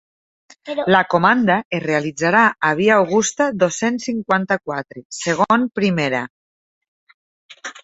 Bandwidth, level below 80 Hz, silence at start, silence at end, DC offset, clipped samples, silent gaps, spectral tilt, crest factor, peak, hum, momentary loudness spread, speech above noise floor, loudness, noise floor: 8.2 kHz; -60 dBFS; 0.65 s; 0.05 s; under 0.1%; under 0.1%; 1.65-1.71 s, 5.05-5.10 s, 6.30-6.81 s, 6.88-7.07 s, 7.14-7.49 s; -4.5 dB/octave; 18 dB; 0 dBFS; none; 13 LU; over 72 dB; -18 LUFS; under -90 dBFS